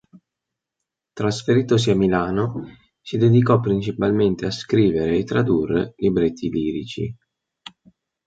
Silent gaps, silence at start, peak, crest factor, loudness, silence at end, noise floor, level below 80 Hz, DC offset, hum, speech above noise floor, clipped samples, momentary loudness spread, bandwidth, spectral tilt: none; 1.15 s; -4 dBFS; 18 dB; -20 LUFS; 1.15 s; -84 dBFS; -48 dBFS; under 0.1%; none; 65 dB; under 0.1%; 11 LU; 9 kHz; -7 dB/octave